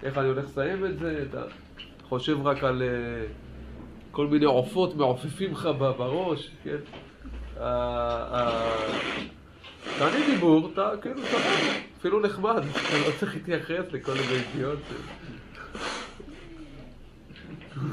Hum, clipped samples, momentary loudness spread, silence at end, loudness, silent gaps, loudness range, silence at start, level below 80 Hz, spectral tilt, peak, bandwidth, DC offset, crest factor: none; under 0.1%; 21 LU; 0 s; -27 LUFS; none; 7 LU; 0 s; -48 dBFS; -5.5 dB/octave; -10 dBFS; 14 kHz; under 0.1%; 18 dB